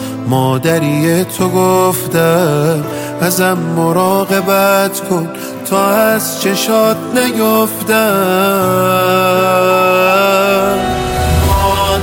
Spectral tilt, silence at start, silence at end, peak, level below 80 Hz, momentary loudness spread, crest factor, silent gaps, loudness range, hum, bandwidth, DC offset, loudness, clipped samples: -5 dB/octave; 0 s; 0 s; 0 dBFS; -30 dBFS; 5 LU; 12 dB; none; 2 LU; none; 17 kHz; under 0.1%; -12 LUFS; under 0.1%